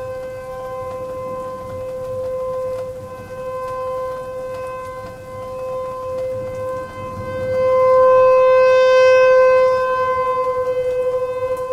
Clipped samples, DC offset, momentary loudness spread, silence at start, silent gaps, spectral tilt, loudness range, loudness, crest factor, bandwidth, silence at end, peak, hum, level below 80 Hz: under 0.1%; under 0.1%; 18 LU; 0 s; none; -5 dB/octave; 14 LU; -17 LUFS; 14 dB; 10 kHz; 0 s; -4 dBFS; none; -48 dBFS